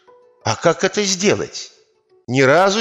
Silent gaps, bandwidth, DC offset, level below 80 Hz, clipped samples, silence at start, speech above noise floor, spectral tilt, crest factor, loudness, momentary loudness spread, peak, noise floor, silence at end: none; 12.5 kHz; under 0.1%; -60 dBFS; under 0.1%; 0.45 s; 40 dB; -3.5 dB/octave; 16 dB; -17 LUFS; 15 LU; -2 dBFS; -57 dBFS; 0 s